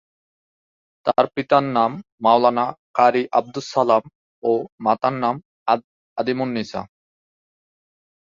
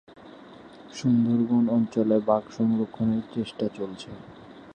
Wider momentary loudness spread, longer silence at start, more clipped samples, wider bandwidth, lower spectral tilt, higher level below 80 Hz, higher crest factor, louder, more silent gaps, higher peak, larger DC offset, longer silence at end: second, 10 LU vs 19 LU; first, 1.05 s vs 0.2 s; neither; second, 7.6 kHz vs 8.8 kHz; second, -6 dB/octave vs -8 dB/octave; about the same, -64 dBFS vs -62 dBFS; about the same, 20 dB vs 18 dB; first, -20 LUFS vs -25 LUFS; first, 2.12-2.18 s, 2.79-2.94 s, 4.15-4.42 s, 4.72-4.78 s, 5.45-5.66 s, 5.84-6.16 s vs none; first, -2 dBFS vs -8 dBFS; neither; first, 1.4 s vs 0 s